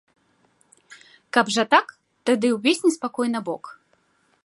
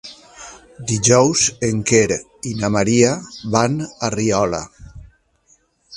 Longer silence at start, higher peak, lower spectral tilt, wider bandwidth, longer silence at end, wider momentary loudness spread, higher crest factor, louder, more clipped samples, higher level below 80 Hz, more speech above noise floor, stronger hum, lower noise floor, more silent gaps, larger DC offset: first, 0.9 s vs 0.05 s; about the same, -2 dBFS vs 0 dBFS; about the same, -3.5 dB/octave vs -4 dB/octave; about the same, 11.5 kHz vs 11.5 kHz; first, 0.7 s vs 0 s; second, 14 LU vs 23 LU; about the same, 22 dB vs 20 dB; second, -22 LUFS vs -17 LUFS; neither; second, -78 dBFS vs -46 dBFS; about the same, 44 dB vs 41 dB; neither; first, -65 dBFS vs -58 dBFS; neither; neither